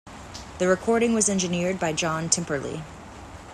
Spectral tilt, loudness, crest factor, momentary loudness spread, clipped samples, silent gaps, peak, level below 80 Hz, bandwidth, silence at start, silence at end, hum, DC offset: -3.5 dB/octave; -24 LUFS; 20 dB; 19 LU; under 0.1%; none; -4 dBFS; -50 dBFS; 13 kHz; 0.05 s; 0 s; none; under 0.1%